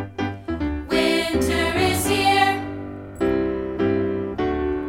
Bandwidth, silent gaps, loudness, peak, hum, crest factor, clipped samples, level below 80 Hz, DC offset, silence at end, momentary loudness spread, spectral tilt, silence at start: 17.5 kHz; none; -22 LUFS; -6 dBFS; none; 16 dB; under 0.1%; -38 dBFS; under 0.1%; 0 s; 10 LU; -4.5 dB/octave; 0 s